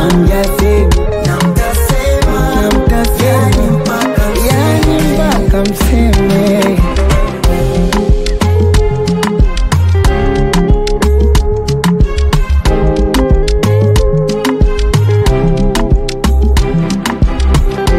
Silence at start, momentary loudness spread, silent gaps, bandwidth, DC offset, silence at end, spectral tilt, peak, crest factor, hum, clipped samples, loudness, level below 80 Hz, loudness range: 0 s; 3 LU; none; 16 kHz; under 0.1%; 0 s; -6 dB/octave; 0 dBFS; 10 dB; none; under 0.1%; -11 LUFS; -12 dBFS; 1 LU